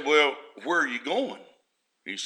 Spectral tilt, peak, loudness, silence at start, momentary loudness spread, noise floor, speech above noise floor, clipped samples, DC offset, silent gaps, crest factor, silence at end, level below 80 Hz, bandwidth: -2 dB/octave; -6 dBFS; -26 LUFS; 0 s; 19 LU; -73 dBFS; 47 dB; under 0.1%; under 0.1%; none; 20 dB; 0 s; -90 dBFS; 10.5 kHz